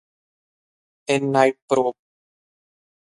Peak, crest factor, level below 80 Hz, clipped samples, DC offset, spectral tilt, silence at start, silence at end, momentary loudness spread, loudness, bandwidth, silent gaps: -2 dBFS; 22 dB; -72 dBFS; under 0.1%; under 0.1%; -5 dB/octave; 1.1 s; 1.15 s; 8 LU; -21 LUFS; 11.5 kHz; 1.62-1.68 s